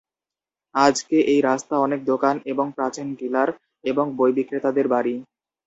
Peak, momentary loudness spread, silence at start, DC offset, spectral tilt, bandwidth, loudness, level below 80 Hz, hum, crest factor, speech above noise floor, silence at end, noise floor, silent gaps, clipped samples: -2 dBFS; 8 LU; 0.75 s; under 0.1%; -4.5 dB/octave; 8.2 kHz; -22 LUFS; -68 dBFS; none; 20 dB; 69 dB; 0.45 s; -90 dBFS; none; under 0.1%